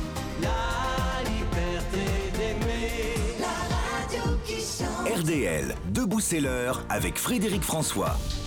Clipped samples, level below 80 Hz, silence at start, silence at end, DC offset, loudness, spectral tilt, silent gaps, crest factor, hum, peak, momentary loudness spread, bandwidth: under 0.1%; -34 dBFS; 0 s; 0 s; under 0.1%; -28 LUFS; -4.5 dB/octave; none; 10 dB; none; -16 dBFS; 4 LU; over 20 kHz